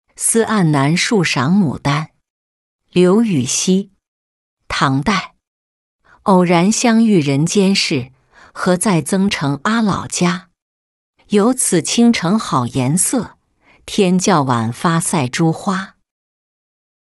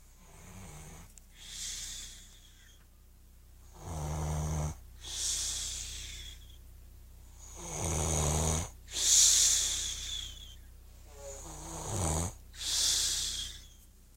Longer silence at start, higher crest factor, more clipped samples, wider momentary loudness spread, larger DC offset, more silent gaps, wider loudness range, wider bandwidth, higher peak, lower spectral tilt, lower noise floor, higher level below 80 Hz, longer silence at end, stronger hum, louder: about the same, 0.2 s vs 0.2 s; second, 14 dB vs 24 dB; neither; second, 9 LU vs 25 LU; neither; first, 2.30-2.79 s, 4.08-4.57 s, 5.47-5.99 s, 10.62-11.14 s vs none; second, 3 LU vs 17 LU; second, 12.5 kHz vs 16 kHz; first, -2 dBFS vs -10 dBFS; first, -4.5 dB/octave vs -1.5 dB/octave; second, -54 dBFS vs -58 dBFS; about the same, -50 dBFS vs -46 dBFS; first, 1.15 s vs 0.3 s; neither; first, -15 LUFS vs -30 LUFS